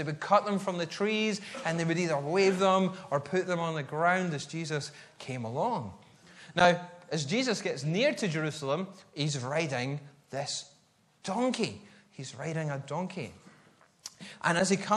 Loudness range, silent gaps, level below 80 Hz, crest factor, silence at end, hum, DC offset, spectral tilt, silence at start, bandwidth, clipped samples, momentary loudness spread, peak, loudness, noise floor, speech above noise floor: 7 LU; none; -72 dBFS; 24 dB; 0 s; none; under 0.1%; -5 dB/octave; 0 s; 12 kHz; under 0.1%; 15 LU; -6 dBFS; -30 LUFS; -66 dBFS; 36 dB